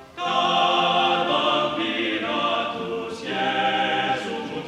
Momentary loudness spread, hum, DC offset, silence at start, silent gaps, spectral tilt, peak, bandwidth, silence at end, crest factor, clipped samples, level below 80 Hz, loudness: 9 LU; none; under 0.1%; 0 s; none; -4 dB/octave; -8 dBFS; 12 kHz; 0 s; 16 dB; under 0.1%; -62 dBFS; -22 LUFS